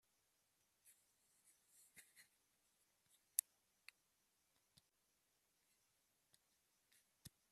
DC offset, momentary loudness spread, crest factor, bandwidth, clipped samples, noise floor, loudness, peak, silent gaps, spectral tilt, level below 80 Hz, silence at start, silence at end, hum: under 0.1%; 22 LU; 46 dB; 14 kHz; under 0.1%; -85 dBFS; -45 LUFS; -14 dBFS; none; 0.5 dB/octave; under -90 dBFS; 1.95 s; 0.25 s; none